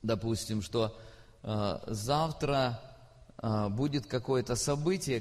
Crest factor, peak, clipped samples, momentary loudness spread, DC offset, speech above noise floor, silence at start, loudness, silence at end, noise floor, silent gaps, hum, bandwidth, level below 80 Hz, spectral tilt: 16 dB; -16 dBFS; under 0.1%; 7 LU; under 0.1%; 23 dB; 0 s; -32 LUFS; 0 s; -55 dBFS; none; none; 14 kHz; -54 dBFS; -5.5 dB/octave